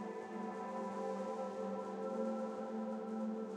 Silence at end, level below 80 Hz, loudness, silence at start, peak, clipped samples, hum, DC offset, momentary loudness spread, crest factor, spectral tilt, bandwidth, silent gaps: 0 s; under -90 dBFS; -42 LUFS; 0 s; -28 dBFS; under 0.1%; none; under 0.1%; 4 LU; 14 dB; -7 dB/octave; 10.5 kHz; none